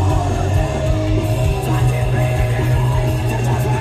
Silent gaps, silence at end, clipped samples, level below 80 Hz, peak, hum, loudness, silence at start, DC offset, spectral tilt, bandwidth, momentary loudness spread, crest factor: none; 0 s; under 0.1%; -24 dBFS; -4 dBFS; none; -18 LUFS; 0 s; under 0.1%; -7 dB/octave; 14 kHz; 2 LU; 12 dB